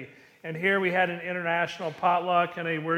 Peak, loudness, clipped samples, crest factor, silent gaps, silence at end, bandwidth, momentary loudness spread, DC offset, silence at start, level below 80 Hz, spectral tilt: -10 dBFS; -26 LUFS; under 0.1%; 16 dB; none; 0 s; 15 kHz; 11 LU; under 0.1%; 0 s; -74 dBFS; -6 dB/octave